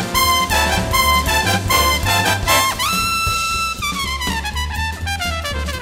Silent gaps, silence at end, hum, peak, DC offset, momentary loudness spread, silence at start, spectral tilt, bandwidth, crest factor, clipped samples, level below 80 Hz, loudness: none; 0 s; none; 0 dBFS; under 0.1%; 8 LU; 0 s; -2.5 dB/octave; 16.5 kHz; 18 dB; under 0.1%; -28 dBFS; -16 LUFS